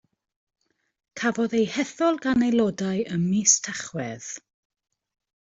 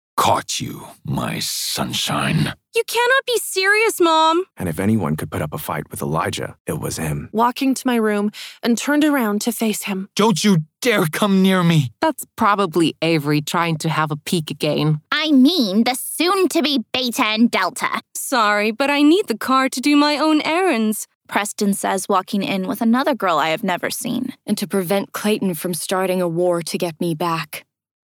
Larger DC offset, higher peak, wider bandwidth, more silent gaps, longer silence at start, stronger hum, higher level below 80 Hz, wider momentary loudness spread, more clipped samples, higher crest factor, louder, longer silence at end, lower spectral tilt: neither; second, -6 dBFS vs 0 dBFS; second, 8 kHz vs 20 kHz; second, none vs 6.60-6.65 s, 21.15-21.21 s; first, 1.15 s vs 0.15 s; neither; second, -62 dBFS vs -54 dBFS; first, 15 LU vs 9 LU; neither; about the same, 20 dB vs 18 dB; second, -24 LUFS vs -19 LUFS; first, 1.05 s vs 0.55 s; about the same, -4 dB/octave vs -4.5 dB/octave